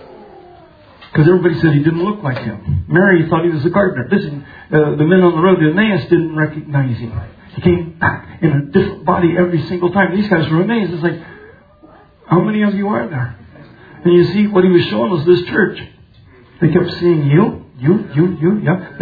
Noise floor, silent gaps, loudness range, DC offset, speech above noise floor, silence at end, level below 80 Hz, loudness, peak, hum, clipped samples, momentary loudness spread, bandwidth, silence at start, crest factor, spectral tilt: -44 dBFS; none; 3 LU; under 0.1%; 30 dB; 0 s; -44 dBFS; -14 LUFS; 0 dBFS; none; under 0.1%; 9 LU; 5 kHz; 0 s; 14 dB; -10.5 dB/octave